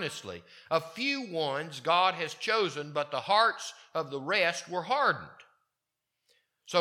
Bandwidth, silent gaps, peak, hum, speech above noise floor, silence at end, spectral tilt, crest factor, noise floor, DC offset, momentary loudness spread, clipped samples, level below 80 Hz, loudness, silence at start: 16.5 kHz; none; -10 dBFS; none; 55 dB; 0 s; -3 dB/octave; 22 dB; -86 dBFS; under 0.1%; 11 LU; under 0.1%; -80 dBFS; -30 LUFS; 0 s